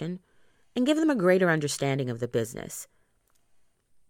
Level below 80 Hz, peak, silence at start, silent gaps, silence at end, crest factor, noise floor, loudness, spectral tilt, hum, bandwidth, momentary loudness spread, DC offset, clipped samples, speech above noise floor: -66 dBFS; -8 dBFS; 0 s; none; 1.25 s; 20 dB; -68 dBFS; -26 LUFS; -5.5 dB/octave; none; 17.5 kHz; 17 LU; under 0.1%; under 0.1%; 42 dB